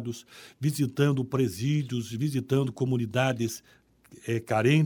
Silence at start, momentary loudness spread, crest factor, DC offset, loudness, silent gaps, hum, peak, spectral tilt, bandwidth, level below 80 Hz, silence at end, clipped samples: 0 s; 12 LU; 18 dB; under 0.1%; -28 LUFS; none; none; -10 dBFS; -6.5 dB/octave; over 20 kHz; -64 dBFS; 0 s; under 0.1%